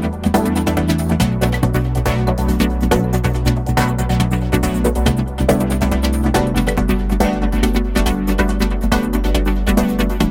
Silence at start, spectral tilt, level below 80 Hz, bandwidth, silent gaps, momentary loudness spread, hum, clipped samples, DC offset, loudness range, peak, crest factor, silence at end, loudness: 0 s; -6 dB/octave; -20 dBFS; 17 kHz; none; 2 LU; none; under 0.1%; under 0.1%; 0 LU; 0 dBFS; 14 dB; 0 s; -17 LUFS